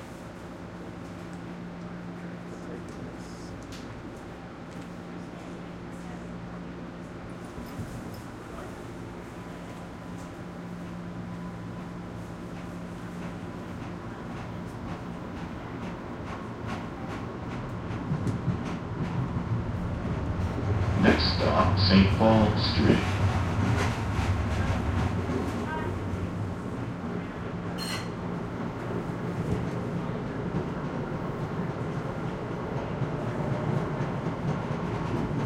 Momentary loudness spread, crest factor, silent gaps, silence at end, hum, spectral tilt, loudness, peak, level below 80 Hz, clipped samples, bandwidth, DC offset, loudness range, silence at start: 16 LU; 24 dB; none; 0 s; none; -7 dB/octave; -31 LUFS; -6 dBFS; -44 dBFS; under 0.1%; 14.5 kHz; under 0.1%; 16 LU; 0 s